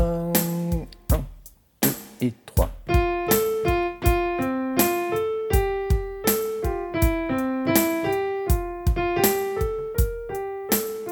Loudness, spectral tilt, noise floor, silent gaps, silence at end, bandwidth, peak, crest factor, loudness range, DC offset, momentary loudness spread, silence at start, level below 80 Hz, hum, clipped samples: -24 LUFS; -5 dB/octave; -48 dBFS; none; 0 s; 19 kHz; -4 dBFS; 20 dB; 2 LU; under 0.1%; 6 LU; 0 s; -30 dBFS; none; under 0.1%